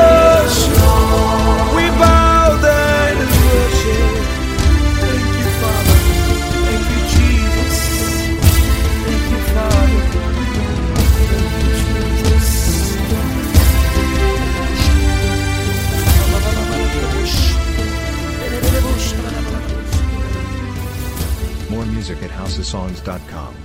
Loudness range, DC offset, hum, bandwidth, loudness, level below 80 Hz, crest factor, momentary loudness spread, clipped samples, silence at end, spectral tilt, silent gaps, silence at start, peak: 8 LU; under 0.1%; none; 16.5 kHz; -15 LUFS; -18 dBFS; 14 dB; 11 LU; under 0.1%; 0 s; -5 dB/octave; none; 0 s; 0 dBFS